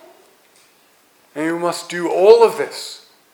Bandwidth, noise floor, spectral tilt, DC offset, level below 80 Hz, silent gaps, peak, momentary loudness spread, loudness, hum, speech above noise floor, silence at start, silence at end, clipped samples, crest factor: 17.5 kHz; -54 dBFS; -4 dB/octave; under 0.1%; -70 dBFS; none; 0 dBFS; 22 LU; -16 LUFS; none; 39 dB; 1.35 s; 0.35 s; under 0.1%; 18 dB